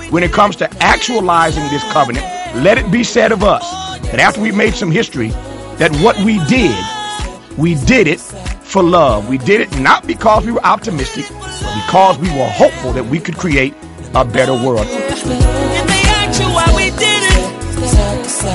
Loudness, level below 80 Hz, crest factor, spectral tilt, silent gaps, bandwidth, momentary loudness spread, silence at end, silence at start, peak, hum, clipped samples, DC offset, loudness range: -13 LUFS; -22 dBFS; 12 dB; -4.5 dB/octave; none; 12 kHz; 10 LU; 0 s; 0 s; 0 dBFS; none; 0.1%; under 0.1%; 2 LU